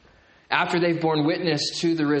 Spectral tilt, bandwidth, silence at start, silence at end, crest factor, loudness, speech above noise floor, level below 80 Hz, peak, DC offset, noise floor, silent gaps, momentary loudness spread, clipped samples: -5 dB/octave; 8.8 kHz; 0.5 s; 0 s; 20 dB; -23 LUFS; 33 dB; -64 dBFS; -4 dBFS; under 0.1%; -56 dBFS; none; 2 LU; under 0.1%